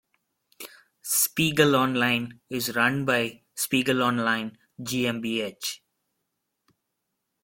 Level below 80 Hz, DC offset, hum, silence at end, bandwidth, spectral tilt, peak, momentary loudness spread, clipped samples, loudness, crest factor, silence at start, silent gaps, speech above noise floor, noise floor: -66 dBFS; under 0.1%; none; 1.65 s; 17 kHz; -3.5 dB/octave; -6 dBFS; 18 LU; under 0.1%; -25 LUFS; 20 dB; 0.6 s; none; 55 dB; -80 dBFS